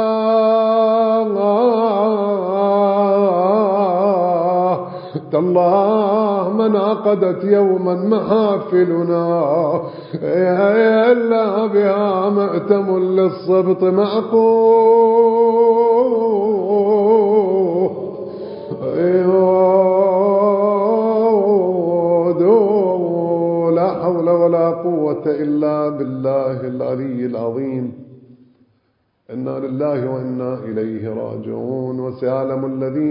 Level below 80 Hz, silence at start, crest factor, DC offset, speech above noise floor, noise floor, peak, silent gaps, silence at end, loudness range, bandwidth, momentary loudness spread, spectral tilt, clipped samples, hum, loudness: -64 dBFS; 0 s; 14 dB; under 0.1%; 48 dB; -64 dBFS; -2 dBFS; none; 0 s; 10 LU; 5.4 kHz; 10 LU; -12.5 dB/octave; under 0.1%; none; -16 LUFS